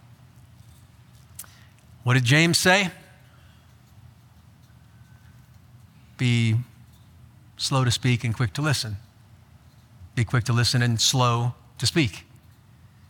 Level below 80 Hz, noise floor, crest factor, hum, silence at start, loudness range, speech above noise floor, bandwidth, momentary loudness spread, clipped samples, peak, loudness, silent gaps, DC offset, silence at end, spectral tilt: -56 dBFS; -52 dBFS; 22 dB; none; 1.4 s; 7 LU; 31 dB; 18 kHz; 23 LU; under 0.1%; -4 dBFS; -22 LUFS; none; under 0.1%; 0.9 s; -4 dB/octave